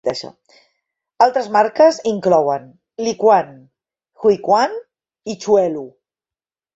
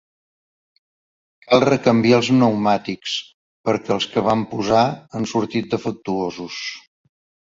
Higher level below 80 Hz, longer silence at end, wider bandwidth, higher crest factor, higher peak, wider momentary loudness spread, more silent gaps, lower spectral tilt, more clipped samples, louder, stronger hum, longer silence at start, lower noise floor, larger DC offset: second, -64 dBFS vs -56 dBFS; first, 0.85 s vs 0.6 s; about the same, 8 kHz vs 7.8 kHz; about the same, 16 dB vs 20 dB; about the same, -2 dBFS vs -2 dBFS; first, 19 LU vs 12 LU; second, none vs 3.34-3.64 s; about the same, -5 dB/octave vs -5.5 dB/octave; neither; first, -16 LUFS vs -19 LUFS; neither; second, 0.05 s vs 1.5 s; about the same, under -90 dBFS vs under -90 dBFS; neither